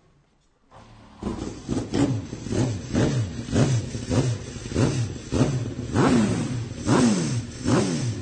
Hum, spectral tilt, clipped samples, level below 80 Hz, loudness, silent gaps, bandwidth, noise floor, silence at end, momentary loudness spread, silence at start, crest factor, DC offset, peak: none; -6 dB/octave; under 0.1%; -42 dBFS; -25 LUFS; none; 9.4 kHz; -62 dBFS; 0 s; 10 LU; 0.75 s; 16 dB; under 0.1%; -8 dBFS